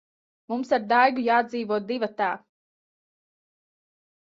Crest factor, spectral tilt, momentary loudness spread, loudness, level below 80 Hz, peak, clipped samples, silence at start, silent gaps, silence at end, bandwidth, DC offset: 20 dB; -5.5 dB/octave; 12 LU; -24 LUFS; -74 dBFS; -6 dBFS; under 0.1%; 0.5 s; none; 1.95 s; 7.6 kHz; under 0.1%